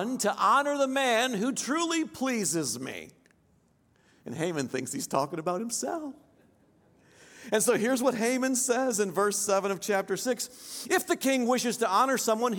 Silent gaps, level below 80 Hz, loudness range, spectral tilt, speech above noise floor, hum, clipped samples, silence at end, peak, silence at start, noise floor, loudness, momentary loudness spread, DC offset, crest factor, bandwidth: none; -76 dBFS; 6 LU; -3 dB/octave; 38 dB; none; under 0.1%; 0 s; -12 dBFS; 0 s; -66 dBFS; -28 LUFS; 10 LU; under 0.1%; 18 dB; 17.5 kHz